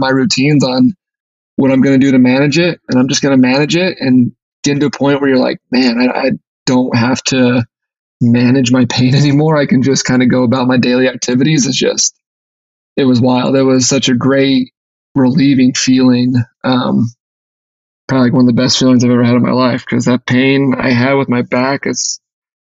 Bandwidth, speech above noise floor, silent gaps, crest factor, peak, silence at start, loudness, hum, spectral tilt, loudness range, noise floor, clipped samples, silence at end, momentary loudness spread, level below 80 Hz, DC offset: 8 kHz; over 80 dB; 1.20-1.57 s, 4.42-4.63 s, 6.47-6.66 s, 7.99-8.20 s, 12.26-12.96 s, 14.77-15.15 s, 17.20-18.08 s; 10 dB; -2 dBFS; 0 s; -11 LUFS; none; -5 dB/octave; 2 LU; under -90 dBFS; under 0.1%; 0.6 s; 6 LU; -50 dBFS; under 0.1%